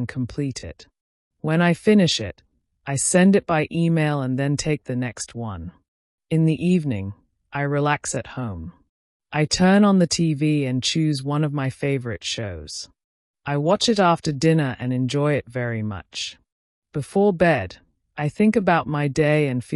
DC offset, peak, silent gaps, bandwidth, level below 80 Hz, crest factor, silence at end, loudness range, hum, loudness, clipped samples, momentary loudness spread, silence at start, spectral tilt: under 0.1%; -6 dBFS; 1.01-1.31 s, 5.88-6.18 s, 8.89-9.20 s, 13.04-13.34 s, 16.52-16.82 s; 12 kHz; -52 dBFS; 16 dB; 0 s; 4 LU; none; -21 LUFS; under 0.1%; 15 LU; 0 s; -5.5 dB/octave